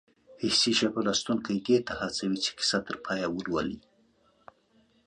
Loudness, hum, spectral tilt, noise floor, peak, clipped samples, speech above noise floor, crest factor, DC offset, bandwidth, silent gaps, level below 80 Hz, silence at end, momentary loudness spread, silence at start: -28 LUFS; none; -3.5 dB/octave; -66 dBFS; -10 dBFS; under 0.1%; 37 dB; 20 dB; under 0.1%; 10.5 kHz; none; -60 dBFS; 1.25 s; 9 LU; 0.3 s